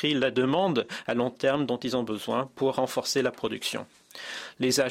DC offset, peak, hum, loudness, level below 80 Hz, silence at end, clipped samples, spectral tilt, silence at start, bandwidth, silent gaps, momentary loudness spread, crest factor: under 0.1%; -12 dBFS; none; -28 LUFS; -68 dBFS; 0 s; under 0.1%; -4 dB/octave; 0 s; 16 kHz; none; 12 LU; 16 dB